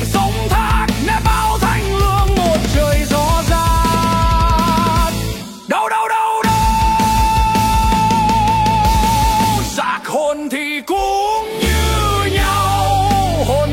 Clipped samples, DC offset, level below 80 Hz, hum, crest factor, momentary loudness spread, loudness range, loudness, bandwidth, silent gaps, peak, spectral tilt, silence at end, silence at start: under 0.1%; under 0.1%; -20 dBFS; none; 12 dB; 5 LU; 3 LU; -15 LUFS; 16.5 kHz; none; -2 dBFS; -5 dB/octave; 0 s; 0 s